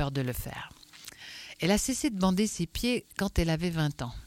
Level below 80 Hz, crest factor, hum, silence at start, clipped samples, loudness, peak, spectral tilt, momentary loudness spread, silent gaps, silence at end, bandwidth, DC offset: -42 dBFS; 18 dB; none; 0 s; under 0.1%; -30 LUFS; -12 dBFS; -5 dB/octave; 16 LU; none; 0 s; 16.5 kHz; under 0.1%